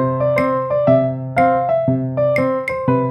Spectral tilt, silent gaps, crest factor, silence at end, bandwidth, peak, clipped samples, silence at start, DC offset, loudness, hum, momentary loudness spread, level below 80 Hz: -9 dB/octave; none; 16 dB; 0 s; 13 kHz; -2 dBFS; under 0.1%; 0 s; under 0.1%; -17 LUFS; none; 4 LU; -50 dBFS